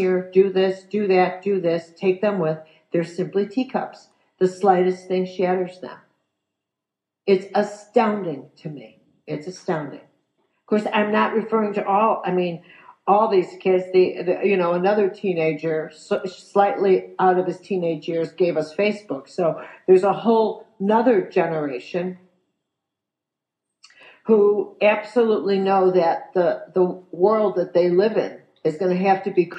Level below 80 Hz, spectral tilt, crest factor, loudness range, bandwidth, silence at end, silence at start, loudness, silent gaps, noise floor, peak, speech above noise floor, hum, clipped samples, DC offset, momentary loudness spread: -80 dBFS; -7.5 dB/octave; 18 dB; 5 LU; 8.8 kHz; 0 s; 0 s; -21 LUFS; none; -85 dBFS; -4 dBFS; 65 dB; none; under 0.1%; under 0.1%; 11 LU